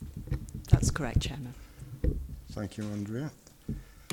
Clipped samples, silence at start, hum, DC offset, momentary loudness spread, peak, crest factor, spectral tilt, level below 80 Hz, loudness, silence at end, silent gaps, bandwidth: under 0.1%; 0 s; none; under 0.1%; 17 LU; -6 dBFS; 26 dB; -5.5 dB/octave; -38 dBFS; -33 LUFS; 0.05 s; none; 18 kHz